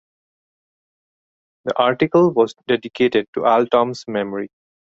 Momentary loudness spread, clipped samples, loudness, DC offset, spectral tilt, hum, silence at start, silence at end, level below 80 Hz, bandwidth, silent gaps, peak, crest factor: 11 LU; under 0.1%; -18 LUFS; under 0.1%; -6.5 dB/octave; none; 1.65 s; 0.45 s; -60 dBFS; 7.8 kHz; 3.28-3.33 s; -2 dBFS; 18 dB